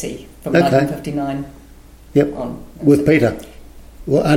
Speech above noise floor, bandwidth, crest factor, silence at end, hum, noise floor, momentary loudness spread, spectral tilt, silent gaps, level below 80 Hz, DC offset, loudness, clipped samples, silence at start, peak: 25 dB; 16.5 kHz; 16 dB; 0 s; none; -42 dBFS; 16 LU; -7 dB/octave; none; -40 dBFS; under 0.1%; -17 LUFS; under 0.1%; 0 s; -2 dBFS